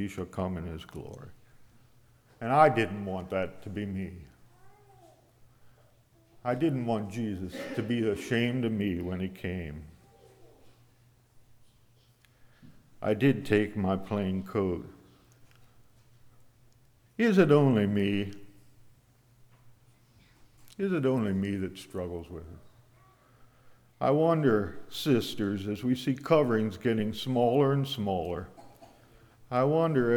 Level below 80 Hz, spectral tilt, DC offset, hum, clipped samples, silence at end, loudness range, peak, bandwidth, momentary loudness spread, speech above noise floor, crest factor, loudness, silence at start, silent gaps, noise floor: -60 dBFS; -7 dB/octave; under 0.1%; none; under 0.1%; 0 s; 9 LU; -8 dBFS; 19.5 kHz; 15 LU; 35 dB; 22 dB; -29 LUFS; 0 s; none; -63 dBFS